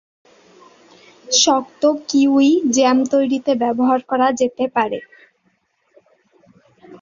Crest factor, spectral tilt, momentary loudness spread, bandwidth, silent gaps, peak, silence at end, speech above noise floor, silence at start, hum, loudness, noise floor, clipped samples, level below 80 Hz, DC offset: 16 dB; -2.5 dB/octave; 6 LU; 7.6 kHz; none; -2 dBFS; 0.05 s; 49 dB; 1.3 s; none; -16 LUFS; -64 dBFS; under 0.1%; -64 dBFS; under 0.1%